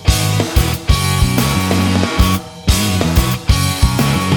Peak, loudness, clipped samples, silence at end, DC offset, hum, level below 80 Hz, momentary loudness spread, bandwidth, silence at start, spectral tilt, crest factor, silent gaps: 0 dBFS; -15 LUFS; under 0.1%; 0 s; under 0.1%; none; -20 dBFS; 2 LU; 19.5 kHz; 0 s; -4.5 dB/octave; 12 dB; none